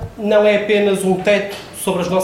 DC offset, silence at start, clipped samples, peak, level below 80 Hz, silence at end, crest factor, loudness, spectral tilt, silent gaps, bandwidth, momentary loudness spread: under 0.1%; 0 s; under 0.1%; -2 dBFS; -48 dBFS; 0 s; 14 dB; -16 LUFS; -5 dB/octave; none; 16.5 kHz; 9 LU